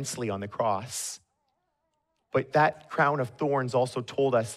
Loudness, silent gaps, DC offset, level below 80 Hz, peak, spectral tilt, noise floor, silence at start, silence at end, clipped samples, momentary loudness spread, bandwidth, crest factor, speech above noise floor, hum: -28 LUFS; none; under 0.1%; -72 dBFS; -10 dBFS; -5 dB/octave; -77 dBFS; 0 s; 0 s; under 0.1%; 9 LU; 14.5 kHz; 18 dB; 50 dB; none